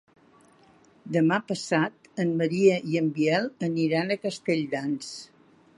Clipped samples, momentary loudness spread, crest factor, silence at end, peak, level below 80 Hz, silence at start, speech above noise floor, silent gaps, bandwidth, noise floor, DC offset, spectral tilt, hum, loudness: under 0.1%; 8 LU; 20 dB; 0.5 s; -8 dBFS; -74 dBFS; 1.05 s; 33 dB; none; 11.5 kHz; -58 dBFS; under 0.1%; -6 dB/octave; none; -26 LUFS